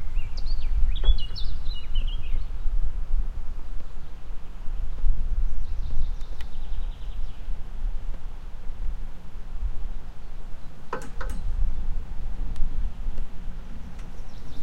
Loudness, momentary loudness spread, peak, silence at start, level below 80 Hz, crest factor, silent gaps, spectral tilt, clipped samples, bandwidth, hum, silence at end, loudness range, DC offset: -35 LUFS; 12 LU; -6 dBFS; 0 s; -26 dBFS; 16 dB; none; -6 dB/octave; under 0.1%; 4.9 kHz; none; 0 s; 7 LU; under 0.1%